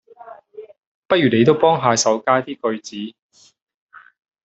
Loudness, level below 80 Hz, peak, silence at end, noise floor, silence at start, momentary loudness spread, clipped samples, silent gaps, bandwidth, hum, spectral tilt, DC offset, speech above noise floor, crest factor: -17 LUFS; -62 dBFS; -2 dBFS; 1.35 s; -42 dBFS; 0.2 s; 19 LU; under 0.1%; 0.86-1.09 s; 8.2 kHz; none; -4.5 dB/octave; under 0.1%; 25 dB; 18 dB